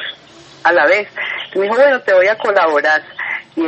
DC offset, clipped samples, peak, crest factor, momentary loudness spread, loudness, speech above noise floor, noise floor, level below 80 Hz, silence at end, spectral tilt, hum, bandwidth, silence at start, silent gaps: under 0.1%; under 0.1%; 0 dBFS; 14 dB; 10 LU; -14 LUFS; 28 dB; -41 dBFS; -66 dBFS; 0 s; -4 dB/octave; none; 8.4 kHz; 0 s; none